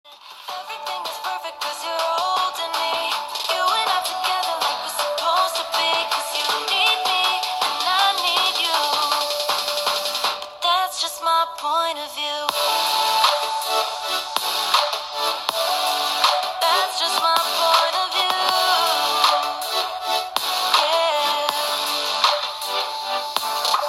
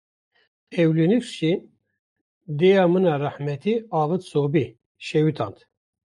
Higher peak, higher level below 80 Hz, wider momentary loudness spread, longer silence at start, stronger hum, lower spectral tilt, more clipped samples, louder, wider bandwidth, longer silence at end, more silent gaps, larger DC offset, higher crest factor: first, 0 dBFS vs -8 dBFS; about the same, -68 dBFS vs -68 dBFS; second, 7 LU vs 13 LU; second, 0.05 s vs 0.7 s; neither; second, 1.5 dB/octave vs -7.5 dB/octave; neither; about the same, -20 LUFS vs -22 LUFS; first, 16.5 kHz vs 11 kHz; second, 0 s vs 0.6 s; second, none vs 1.99-2.41 s, 4.86-4.95 s; neither; about the same, 20 dB vs 16 dB